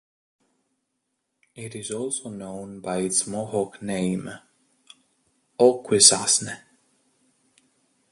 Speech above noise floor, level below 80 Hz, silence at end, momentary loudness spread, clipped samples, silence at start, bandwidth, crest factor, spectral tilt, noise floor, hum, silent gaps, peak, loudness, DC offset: 54 dB; -64 dBFS; 1.55 s; 23 LU; under 0.1%; 1.55 s; 11.5 kHz; 26 dB; -2.5 dB/octave; -78 dBFS; none; none; 0 dBFS; -21 LUFS; under 0.1%